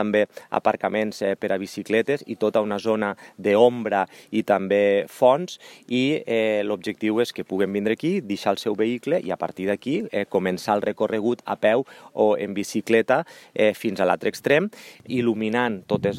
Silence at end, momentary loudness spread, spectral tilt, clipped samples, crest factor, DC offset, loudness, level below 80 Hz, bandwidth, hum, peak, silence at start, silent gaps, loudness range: 0 s; 8 LU; -5.5 dB/octave; under 0.1%; 20 dB; under 0.1%; -23 LUFS; -68 dBFS; 16 kHz; none; -2 dBFS; 0 s; none; 3 LU